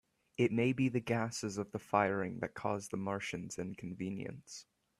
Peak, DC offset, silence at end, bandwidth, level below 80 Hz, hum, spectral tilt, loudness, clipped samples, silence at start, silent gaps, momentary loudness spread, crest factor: -16 dBFS; under 0.1%; 0.4 s; 13.5 kHz; -70 dBFS; none; -5.5 dB/octave; -37 LUFS; under 0.1%; 0.4 s; none; 13 LU; 22 dB